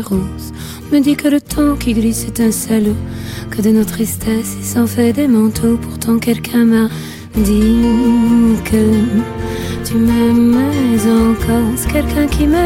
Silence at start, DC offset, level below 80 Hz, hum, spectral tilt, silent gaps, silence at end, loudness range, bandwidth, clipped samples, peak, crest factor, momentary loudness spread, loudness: 0 s; under 0.1%; -28 dBFS; none; -6 dB/octave; none; 0 s; 3 LU; 16.5 kHz; under 0.1%; -2 dBFS; 12 dB; 9 LU; -14 LUFS